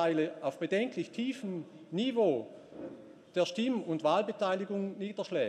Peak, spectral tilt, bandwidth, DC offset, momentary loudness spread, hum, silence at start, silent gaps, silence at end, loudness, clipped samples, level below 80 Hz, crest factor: -16 dBFS; -6 dB/octave; 11.5 kHz; under 0.1%; 16 LU; none; 0 s; none; 0 s; -33 LUFS; under 0.1%; -84 dBFS; 18 dB